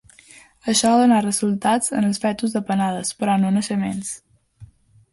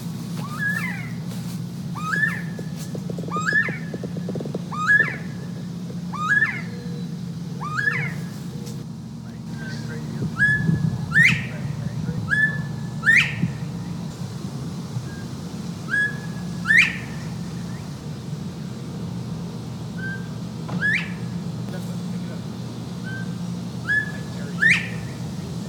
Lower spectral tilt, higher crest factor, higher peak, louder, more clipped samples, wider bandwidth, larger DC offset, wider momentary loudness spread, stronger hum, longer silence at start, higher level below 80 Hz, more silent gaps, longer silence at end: about the same, -4.5 dB/octave vs -5 dB/octave; second, 16 dB vs 22 dB; about the same, -4 dBFS vs -4 dBFS; first, -20 LUFS vs -24 LUFS; neither; second, 11.5 kHz vs 18.5 kHz; neither; second, 11 LU vs 15 LU; neither; first, 0.65 s vs 0 s; second, -58 dBFS vs -50 dBFS; neither; first, 0.45 s vs 0 s